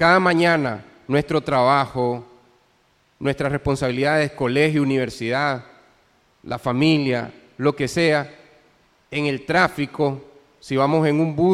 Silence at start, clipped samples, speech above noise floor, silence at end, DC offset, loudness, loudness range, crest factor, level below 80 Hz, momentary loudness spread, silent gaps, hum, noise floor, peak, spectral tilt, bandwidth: 0 s; under 0.1%; 42 dB; 0 s; under 0.1%; -20 LUFS; 1 LU; 18 dB; -50 dBFS; 10 LU; none; none; -61 dBFS; -2 dBFS; -6 dB/octave; 14 kHz